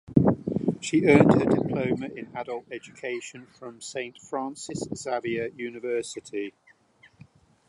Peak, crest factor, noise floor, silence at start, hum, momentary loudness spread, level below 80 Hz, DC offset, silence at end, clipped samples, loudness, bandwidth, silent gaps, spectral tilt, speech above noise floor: -2 dBFS; 24 dB; -59 dBFS; 0.1 s; none; 17 LU; -54 dBFS; under 0.1%; 1.2 s; under 0.1%; -26 LUFS; 11.5 kHz; none; -6.5 dB/octave; 32 dB